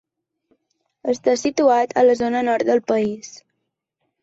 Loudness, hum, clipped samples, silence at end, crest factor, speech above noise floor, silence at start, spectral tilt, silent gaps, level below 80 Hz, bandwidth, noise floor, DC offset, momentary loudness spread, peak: -19 LUFS; none; under 0.1%; 0.85 s; 16 dB; 59 dB; 1.05 s; -4.5 dB/octave; none; -62 dBFS; 8 kHz; -77 dBFS; under 0.1%; 11 LU; -4 dBFS